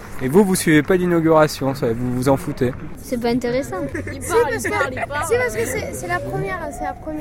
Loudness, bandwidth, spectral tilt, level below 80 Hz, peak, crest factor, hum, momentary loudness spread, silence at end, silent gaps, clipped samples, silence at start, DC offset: -20 LUFS; 16.5 kHz; -5.5 dB/octave; -40 dBFS; -2 dBFS; 18 dB; none; 11 LU; 0 s; none; under 0.1%; 0 s; under 0.1%